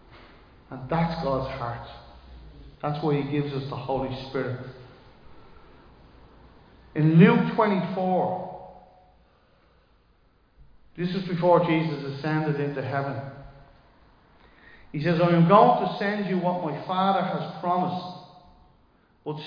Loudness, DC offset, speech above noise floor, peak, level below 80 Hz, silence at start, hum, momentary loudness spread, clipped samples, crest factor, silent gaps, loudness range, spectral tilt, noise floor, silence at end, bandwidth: -24 LUFS; under 0.1%; 38 dB; -4 dBFS; -54 dBFS; 0.15 s; none; 21 LU; under 0.1%; 22 dB; none; 10 LU; -9.5 dB/octave; -62 dBFS; 0 s; 5.2 kHz